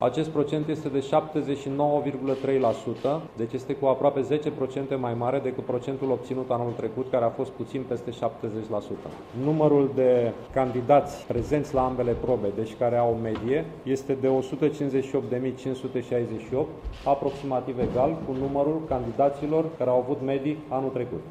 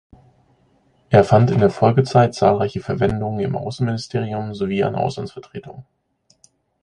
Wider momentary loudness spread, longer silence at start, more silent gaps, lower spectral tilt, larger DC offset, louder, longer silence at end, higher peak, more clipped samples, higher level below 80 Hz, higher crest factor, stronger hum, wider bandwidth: second, 9 LU vs 17 LU; second, 0 s vs 1.1 s; neither; about the same, -8 dB/octave vs -7.5 dB/octave; neither; second, -27 LUFS vs -18 LUFS; second, 0 s vs 1 s; second, -8 dBFS vs 0 dBFS; neither; about the same, -50 dBFS vs -46 dBFS; about the same, 18 dB vs 20 dB; neither; about the same, 10 kHz vs 10 kHz